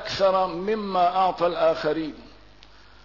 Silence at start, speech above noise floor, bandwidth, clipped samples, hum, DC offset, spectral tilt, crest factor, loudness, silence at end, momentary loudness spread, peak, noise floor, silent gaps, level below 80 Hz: 0 s; 29 dB; 6 kHz; under 0.1%; none; 0.2%; -5.5 dB/octave; 14 dB; -23 LUFS; 0.75 s; 6 LU; -10 dBFS; -51 dBFS; none; -54 dBFS